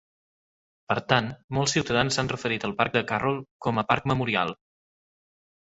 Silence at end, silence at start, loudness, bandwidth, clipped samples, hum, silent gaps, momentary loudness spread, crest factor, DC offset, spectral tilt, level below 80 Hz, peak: 1.25 s; 0.9 s; -26 LUFS; 8.2 kHz; under 0.1%; none; 1.44-1.48 s, 3.51-3.60 s; 6 LU; 24 dB; under 0.1%; -4.5 dB/octave; -54 dBFS; -2 dBFS